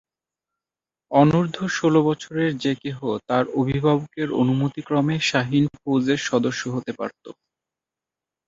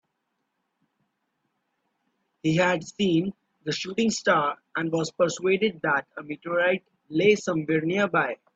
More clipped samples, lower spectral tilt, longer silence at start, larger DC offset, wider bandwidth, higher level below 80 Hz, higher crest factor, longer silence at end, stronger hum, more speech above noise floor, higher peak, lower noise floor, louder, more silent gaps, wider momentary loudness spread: neither; about the same, -6 dB/octave vs -5 dB/octave; second, 1.1 s vs 2.45 s; neither; about the same, 7.8 kHz vs 8.4 kHz; first, -56 dBFS vs -68 dBFS; about the same, 20 dB vs 18 dB; first, 1.15 s vs 0.2 s; neither; first, over 69 dB vs 53 dB; first, -2 dBFS vs -8 dBFS; first, under -90 dBFS vs -78 dBFS; first, -22 LUFS vs -25 LUFS; neither; about the same, 9 LU vs 9 LU